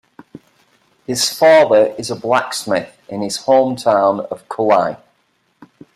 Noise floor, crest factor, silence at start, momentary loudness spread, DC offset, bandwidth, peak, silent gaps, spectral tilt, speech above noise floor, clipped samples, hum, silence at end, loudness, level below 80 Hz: -62 dBFS; 16 dB; 0.35 s; 15 LU; under 0.1%; 14.5 kHz; -2 dBFS; none; -3.5 dB/octave; 48 dB; under 0.1%; none; 1 s; -15 LUFS; -62 dBFS